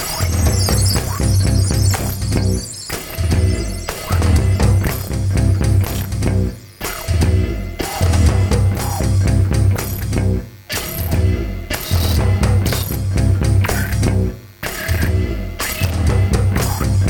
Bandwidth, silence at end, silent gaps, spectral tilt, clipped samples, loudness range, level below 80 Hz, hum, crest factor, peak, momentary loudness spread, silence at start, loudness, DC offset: 19.5 kHz; 0 s; none; -5.5 dB/octave; under 0.1%; 1 LU; -24 dBFS; none; 14 dB; -2 dBFS; 8 LU; 0 s; -18 LUFS; under 0.1%